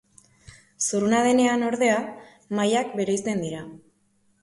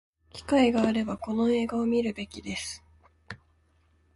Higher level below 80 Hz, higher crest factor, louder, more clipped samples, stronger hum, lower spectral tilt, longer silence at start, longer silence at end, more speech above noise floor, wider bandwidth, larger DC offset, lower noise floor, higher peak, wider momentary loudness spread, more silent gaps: second, -64 dBFS vs -54 dBFS; about the same, 16 dB vs 18 dB; first, -23 LUFS vs -27 LUFS; neither; neither; about the same, -4 dB/octave vs -5 dB/octave; first, 0.8 s vs 0.35 s; second, 0.65 s vs 0.8 s; first, 43 dB vs 39 dB; about the same, 11.5 kHz vs 11.5 kHz; neither; about the same, -66 dBFS vs -66 dBFS; about the same, -10 dBFS vs -10 dBFS; second, 14 LU vs 23 LU; neither